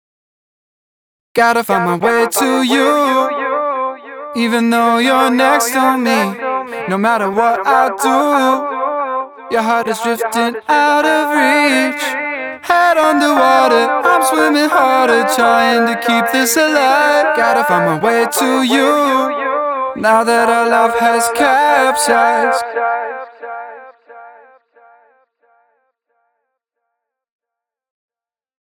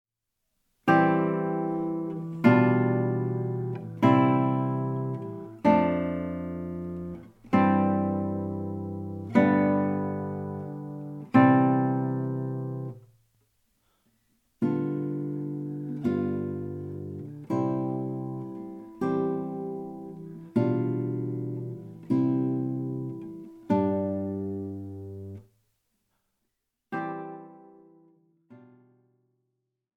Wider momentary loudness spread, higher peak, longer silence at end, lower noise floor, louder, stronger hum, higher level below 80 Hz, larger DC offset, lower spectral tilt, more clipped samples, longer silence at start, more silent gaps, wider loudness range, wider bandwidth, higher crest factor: second, 8 LU vs 17 LU; first, 0 dBFS vs -6 dBFS; first, 4.4 s vs 1.35 s; about the same, -84 dBFS vs -81 dBFS; first, -13 LUFS vs -27 LUFS; neither; about the same, -60 dBFS vs -64 dBFS; neither; second, -3 dB/octave vs -9.5 dB/octave; neither; first, 1.35 s vs 0.85 s; neither; second, 3 LU vs 13 LU; first, over 20 kHz vs 6.2 kHz; second, 14 dB vs 22 dB